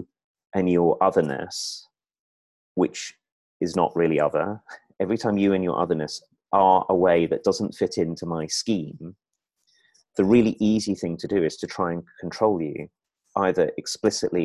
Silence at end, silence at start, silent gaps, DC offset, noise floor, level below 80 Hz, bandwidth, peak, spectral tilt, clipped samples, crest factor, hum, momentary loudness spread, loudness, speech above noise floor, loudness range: 0 s; 0 s; 0.24-0.35 s, 2.20-2.75 s, 3.32-3.60 s; under 0.1%; -72 dBFS; -56 dBFS; 12.5 kHz; -4 dBFS; -5.5 dB/octave; under 0.1%; 20 dB; none; 14 LU; -24 LUFS; 50 dB; 4 LU